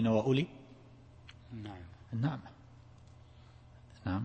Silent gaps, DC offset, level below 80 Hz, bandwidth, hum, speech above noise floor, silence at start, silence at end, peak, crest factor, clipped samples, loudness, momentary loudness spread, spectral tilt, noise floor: none; under 0.1%; -62 dBFS; 8.6 kHz; none; 24 dB; 0 s; 0 s; -16 dBFS; 20 dB; under 0.1%; -36 LUFS; 26 LU; -8 dB/octave; -57 dBFS